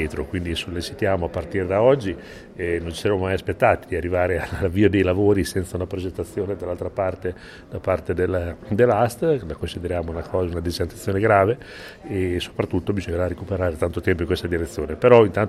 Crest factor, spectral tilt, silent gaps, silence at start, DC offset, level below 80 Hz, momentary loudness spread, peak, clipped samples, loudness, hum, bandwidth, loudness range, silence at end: 22 dB; -6.5 dB/octave; none; 0 s; under 0.1%; -40 dBFS; 11 LU; 0 dBFS; under 0.1%; -22 LUFS; none; 14.5 kHz; 4 LU; 0 s